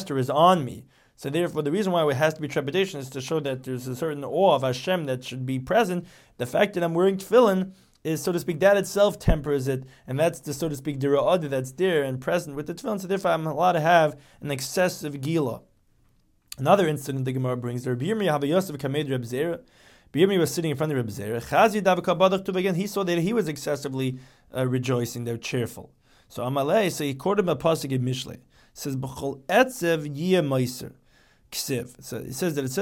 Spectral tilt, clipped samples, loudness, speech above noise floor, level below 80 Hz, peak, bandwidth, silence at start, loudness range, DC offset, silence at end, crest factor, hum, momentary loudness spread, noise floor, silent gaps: -5.5 dB/octave; under 0.1%; -25 LUFS; 38 dB; -46 dBFS; -6 dBFS; 17 kHz; 0 s; 3 LU; under 0.1%; 0 s; 20 dB; none; 12 LU; -63 dBFS; none